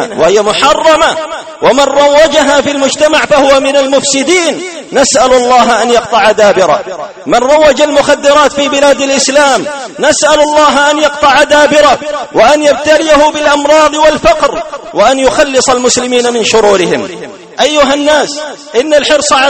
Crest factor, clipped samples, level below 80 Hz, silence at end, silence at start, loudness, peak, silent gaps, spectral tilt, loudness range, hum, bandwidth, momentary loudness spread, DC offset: 8 dB; 2%; -36 dBFS; 0 s; 0 s; -7 LUFS; 0 dBFS; none; -2 dB/octave; 2 LU; none; 12.5 kHz; 8 LU; under 0.1%